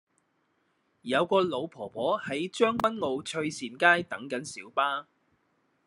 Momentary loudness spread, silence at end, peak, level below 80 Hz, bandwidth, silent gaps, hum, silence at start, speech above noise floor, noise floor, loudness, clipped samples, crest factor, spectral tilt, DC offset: 12 LU; 0.85 s; -6 dBFS; -72 dBFS; 12 kHz; none; none; 1.05 s; 45 dB; -73 dBFS; -28 LUFS; under 0.1%; 24 dB; -4 dB/octave; under 0.1%